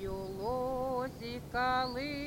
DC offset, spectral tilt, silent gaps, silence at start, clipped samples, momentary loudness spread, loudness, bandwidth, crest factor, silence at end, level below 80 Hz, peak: under 0.1%; -5.5 dB/octave; none; 0 s; under 0.1%; 8 LU; -35 LUFS; 16.5 kHz; 16 dB; 0 s; -52 dBFS; -20 dBFS